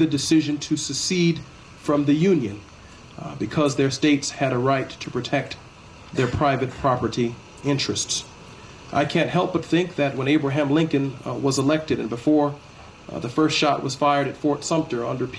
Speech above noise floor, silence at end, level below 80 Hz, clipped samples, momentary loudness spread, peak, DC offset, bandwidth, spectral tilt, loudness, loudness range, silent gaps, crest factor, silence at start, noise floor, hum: 21 dB; 0 s; -52 dBFS; under 0.1%; 12 LU; -6 dBFS; under 0.1%; 11 kHz; -5 dB/octave; -22 LUFS; 2 LU; none; 16 dB; 0 s; -42 dBFS; none